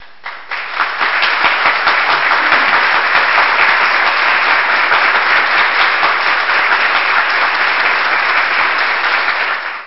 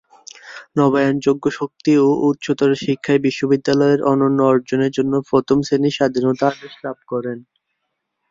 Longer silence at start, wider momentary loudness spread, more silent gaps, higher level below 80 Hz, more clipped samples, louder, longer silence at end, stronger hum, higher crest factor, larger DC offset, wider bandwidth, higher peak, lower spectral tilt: second, 0.25 s vs 0.45 s; second, 5 LU vs 10 LU; neither; about the same, -56 dBFS vs -58 dBFS; neither; first, -11 LUFS vs -17 LUFS; second, 0 s vs 0.9 s; neither; about the same, 12 dB vs 16 dB; first, 2% vs under 0.1%; second, 6 kHz vs 7.6 kHz; about the same, 0 dBFS vs -2 dBFS; second, -2.5 dB/octave vs -6.5 dB/octave